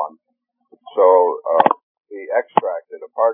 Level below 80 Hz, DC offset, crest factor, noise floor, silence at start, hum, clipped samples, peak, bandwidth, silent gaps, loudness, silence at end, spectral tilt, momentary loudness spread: -88 dBFS; under 0.1%; 18 dB; -72 dBFS; 0 s; none; under 0.1%; 0 dBFS; 3.7 kHz; 1.83-1.95 s; -17 LUFS; 0 s; -9 dB/octave; 18 LU